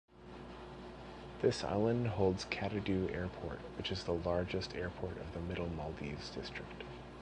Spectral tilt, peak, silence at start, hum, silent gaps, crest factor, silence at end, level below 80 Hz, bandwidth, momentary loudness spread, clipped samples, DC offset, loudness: -6 dB/octave; -18 dBFS; 0.1 s; none; none; 20 dB; 0 s; -54 dBFS; 10 kHz; 16 LU; under 0.1%; under 0.1%; -38 LUFS